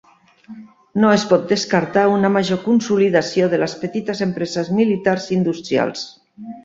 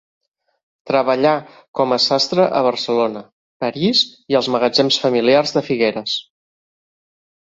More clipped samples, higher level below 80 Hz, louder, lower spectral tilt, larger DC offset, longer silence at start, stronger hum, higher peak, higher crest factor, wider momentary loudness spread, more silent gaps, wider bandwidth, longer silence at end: neither; about the same, -58 dBFS vs -62 dBFS; about the same, -18 LUFS vs -17 LUFS; about the same, -5.5 dB/octave vs -4.5 dB/octave; neither; second, 0.5 s vs 0.85 s; neither; about the same, -2 dBFS vs -2 dBFS; about the same, 16 dB vs 16 dB; about the same, 9 LU vs 9 LU; second, none vs 1.68-1.74 s, 3.32-3.60 s; about the same, 7.8 kHz vs 7.8 kHz; second, 0.05 s vs 1.2 s